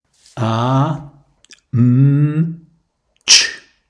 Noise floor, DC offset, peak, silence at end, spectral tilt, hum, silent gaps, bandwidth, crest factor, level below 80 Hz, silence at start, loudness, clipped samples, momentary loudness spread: -63 dBFS; under 0.1%; 0 dBFS; 0.3 s; -4 dB/octave; none; none; 11 kHz; 16 dB; -56 dBFS; 0.35 s; -14 LUFS; under 0.1%; 14 LU